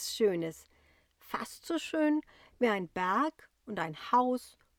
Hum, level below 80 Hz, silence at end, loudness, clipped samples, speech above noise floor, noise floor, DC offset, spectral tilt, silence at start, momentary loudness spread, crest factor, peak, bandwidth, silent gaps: none; -70 dBFS; 0.3 s; -33 LUFS; under 0.1%; 34 dB; -66 dBFS; under 0.1%; -4.5 dB/octave; 0 s; 11 LU; 18 dB; -14 dBFS; 19 kHz; none